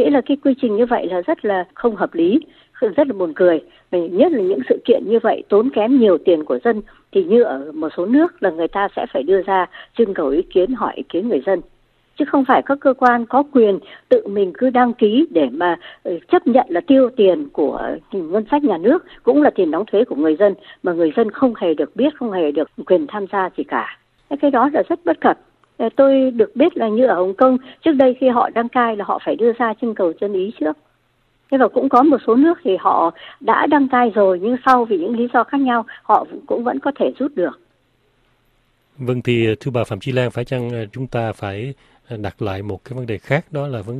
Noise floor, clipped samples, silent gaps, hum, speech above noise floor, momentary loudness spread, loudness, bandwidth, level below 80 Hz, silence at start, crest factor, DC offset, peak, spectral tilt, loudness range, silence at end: -62 dBFS; under 0.1%; none; none; 45 dB; 10 LU; -17 LUFS; 7.4 kHz; -56 dBFS; 0 s; 16 dB; under 0.1%; 0 dBFS; -8 dB/octave; 6 LU; 0 s